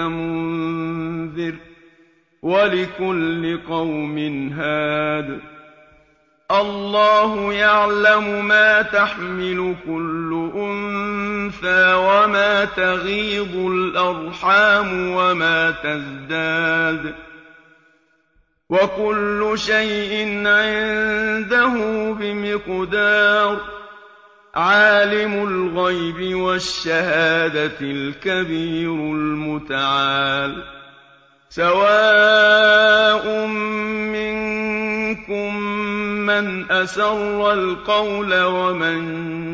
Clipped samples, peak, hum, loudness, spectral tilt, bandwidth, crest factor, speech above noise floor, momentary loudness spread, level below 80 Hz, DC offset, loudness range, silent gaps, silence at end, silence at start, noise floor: under 0.1%; -2 dBFS; none; -18 LUFS; -5 dB/octave; 8 kHz; 16 dB; 43 dB; 11 LU; -50 dBFS; under 0.1%; 8 LU; none; 0 s; 0 s; -61 dBFS